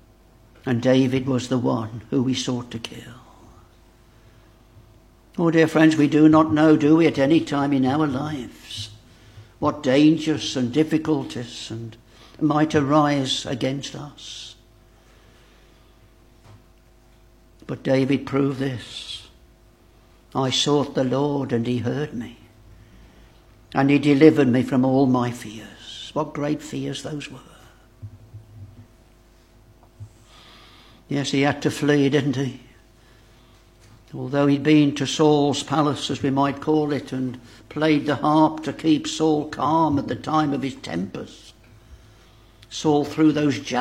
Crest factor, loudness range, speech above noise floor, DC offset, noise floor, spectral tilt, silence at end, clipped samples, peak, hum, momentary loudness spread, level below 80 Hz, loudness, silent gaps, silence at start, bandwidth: 22 dB; 12 LU; 33 dB; under 0.1%; -53 dBFS; -6 dB/octave; 0 s; under 0.1%; 0 dBFS; none; 18 LU; -54 dBFS; -21 LUFS; none; 0.65 s; 12 kHz